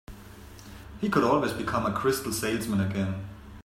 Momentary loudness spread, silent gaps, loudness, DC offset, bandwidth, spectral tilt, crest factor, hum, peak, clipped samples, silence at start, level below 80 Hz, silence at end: 22 LU; none; -28 LUFS; under 0.1%; 16 kHz; -5.5 dB/octave; 20 dB; none; -8 dBFS; under 0.1%; 0.1 s; -50 dBFS; 0.05 s